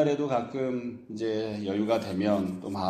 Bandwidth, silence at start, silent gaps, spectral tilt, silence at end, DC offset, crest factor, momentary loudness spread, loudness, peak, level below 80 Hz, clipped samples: 13.5 kHz; 0 s; none; -7 dB/octave; 0 s; under 0.1%; 16 dB; 7 LU; -30 LUFS; -12 dBFS; -66 dBFS; under 0.1%